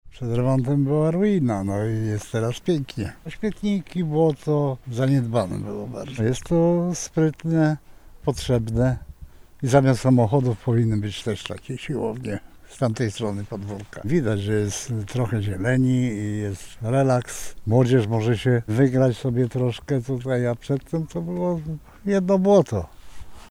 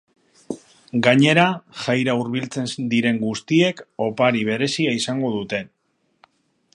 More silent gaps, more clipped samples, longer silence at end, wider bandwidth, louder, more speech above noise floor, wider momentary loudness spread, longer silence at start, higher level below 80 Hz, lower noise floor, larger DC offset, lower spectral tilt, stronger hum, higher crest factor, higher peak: neither; neither; second, 0 s vs 1.1 s; first, 13.5 kHz vs 11 kHz; second, -23 LUFS vs -20 LUFS; second, 22 dB vs 49 dB; about the same, 13 LU vs 13 LU; second, 0.05 s vs 0.5 s; first, -46 dBFS vs -64 dBFS; second, -44 dBFS vs -68 dBFS; neither; first, -7 dB/octave vs -5 dB/octave; neither; about the same, 18 dB vs 20 dB; second, -4 dBFS vs 0 dBFS